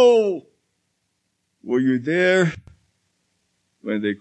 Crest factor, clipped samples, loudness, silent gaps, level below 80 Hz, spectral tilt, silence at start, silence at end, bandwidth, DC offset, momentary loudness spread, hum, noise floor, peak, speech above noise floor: 16 dB; under 0.1%; -20 LUFS; none; -64 dBFS; -6 dB/octave; 0 s; 0.05 s; 8.8 kHz; under 0.1%; 19 LU; none; -73 dBFS; -4 dBFS; 54 dB